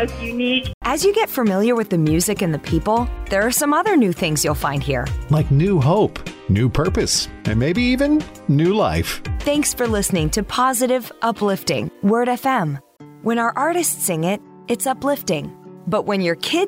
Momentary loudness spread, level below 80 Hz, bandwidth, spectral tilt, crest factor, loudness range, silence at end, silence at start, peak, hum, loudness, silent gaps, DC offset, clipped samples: 7 LU; -34 dBFS; 16.5 kHz; -5 dB/octave; 12 dB; 3 LU; 0 s; 0 s; -8 dBFS; none; -19 LUFS; 0.74-0.81 s; under 0.1%; under 0.1%